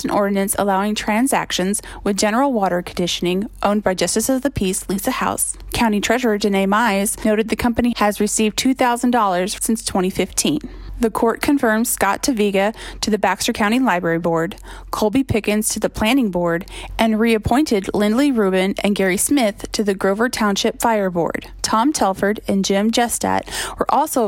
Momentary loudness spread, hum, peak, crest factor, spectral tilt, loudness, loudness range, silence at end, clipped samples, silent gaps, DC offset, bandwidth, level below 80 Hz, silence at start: 5 LU; none; -2 dBFS; 16 dB; -4 dB/octave; -18 LUFS; 2 LU; 0 s; under 0.1%; none; under 0.1%; 16.5 kHz; -40 dBFS; 0 s